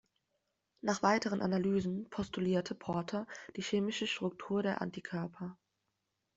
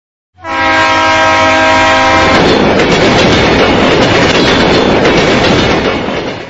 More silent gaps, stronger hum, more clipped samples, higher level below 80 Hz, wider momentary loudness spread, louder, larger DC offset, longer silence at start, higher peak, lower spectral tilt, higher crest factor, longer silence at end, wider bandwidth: neither; neither; second, under 0.1% vs 0.3%; second, -70 dBFS vs -28 dBFS; first, 10 LU vs 5 LU; second, -36 LUFS vs -7 LUFS; neither; first, 0.85 s vs 0.45 s; second, -14 dBFS vs 0 dBFS; about the same, -5.5 dB/octave vs -4.5 dB/octave; first, 22 dB vs 8 dB; first, 0.8 s vs 0 s; second, 8 kHz vs 11 kHz